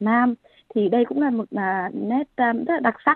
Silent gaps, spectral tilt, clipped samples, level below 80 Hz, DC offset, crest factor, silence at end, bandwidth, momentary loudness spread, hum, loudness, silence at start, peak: none; -10 dB/octave; under 0.1%; -68 dBFS; under 0.1%; 18 dB; 0 s; 4.3 kHz; 5 LU; none; -22 LUFS; 0 s; -4 dBFS